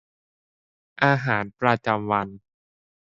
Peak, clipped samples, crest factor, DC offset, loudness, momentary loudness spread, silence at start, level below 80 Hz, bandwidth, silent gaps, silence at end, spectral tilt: -2 dBFS; under 0.1%; 24 dB; under 0.1%; -23 LUFS; 5 LU; 1 s; -62 dBFS; 7.6 kHz; none; 0.7 s; -7.5 dB/octave